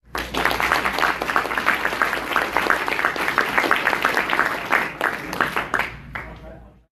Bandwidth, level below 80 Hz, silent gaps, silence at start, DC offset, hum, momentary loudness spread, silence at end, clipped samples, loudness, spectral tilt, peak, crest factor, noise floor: 14 kHz; -46 dBFS; none; 0.1 s; under 0.1%; none; 7 LU; 0.25 s; under 0.1%; -21 LUFS; -3 dB/octave; 0 dBFS; 22 dB; -42 dBFS